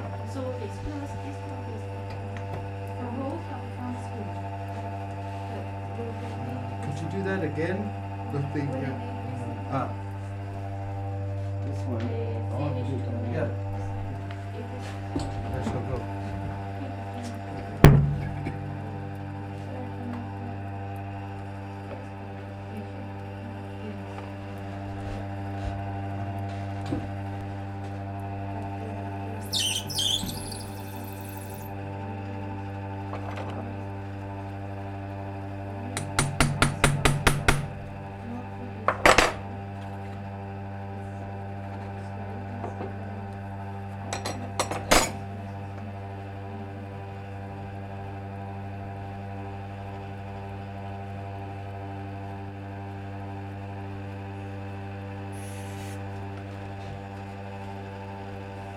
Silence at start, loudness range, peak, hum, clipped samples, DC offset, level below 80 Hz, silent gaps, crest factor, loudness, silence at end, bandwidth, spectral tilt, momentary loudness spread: 0 s; 12 LU; 0 dBFS; none; under 0.1%; under 0.1%; -42 dBFS; none; 30 dB; -31 LUFS; 0 s; 17.5 kHz; -5 dB/octave; 12 LU